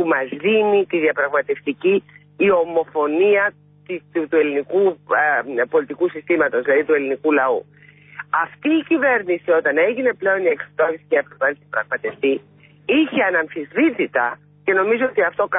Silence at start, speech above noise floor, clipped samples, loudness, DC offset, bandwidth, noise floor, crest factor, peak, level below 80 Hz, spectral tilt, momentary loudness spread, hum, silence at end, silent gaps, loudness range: 0 s; 20 dB; under 0.1%; -19 LUFS; under 0.1%; 3.8 kHz; -38 dBFS; 12 dB; -6 dBFS; -66 dBFS; -10 dB/octave; 7 LU; none; 0 s; none; 2 LU